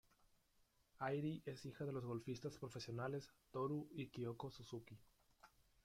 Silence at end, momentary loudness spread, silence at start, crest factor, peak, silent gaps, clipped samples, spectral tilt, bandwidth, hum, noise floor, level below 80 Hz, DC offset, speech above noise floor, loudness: 0.35 s; 9 LU; 1 s; 18 dB; -30 dBFS; none; under 0.1%; -6.5 dB/octave; 16 kHz; none; -79 dBFS; -78 dBFS; under 0.1%; 31 dB; -49 LUFS